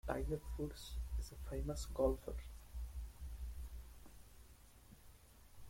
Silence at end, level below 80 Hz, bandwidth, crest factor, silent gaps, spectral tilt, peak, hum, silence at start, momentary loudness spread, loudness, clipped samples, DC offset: 0 s; -48 dBFS; 16.5 kHz; 22 dB; none; -6 dB/octave; -24 dBFS; none; 0.05 s; 25 LU; -45 LUFS; under 0.1%; under 0.1%